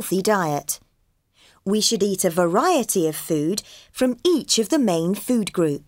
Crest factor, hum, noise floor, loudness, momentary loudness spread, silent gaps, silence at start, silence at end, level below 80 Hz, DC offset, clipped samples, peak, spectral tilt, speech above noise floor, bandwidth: 16 dB; none; -66 dBFS; -21 LUFS; 8 LU; none; 0 s; 0.1 s; -60 dBFS; under 0.1%; under 0.1%; -6 dBFS; -4 dB/octave; 45 dB; 16.5 kHz